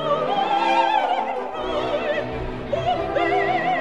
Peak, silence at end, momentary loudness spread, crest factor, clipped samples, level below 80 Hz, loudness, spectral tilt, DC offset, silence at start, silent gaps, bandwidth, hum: -8 dBFS; 0 s; 8 LU; 14 dB; under 0.1%; -42 dBFS; -22 LUFS; -5.5 dB/octave; 0.6%; 0 s; none; 10.5 kHz; none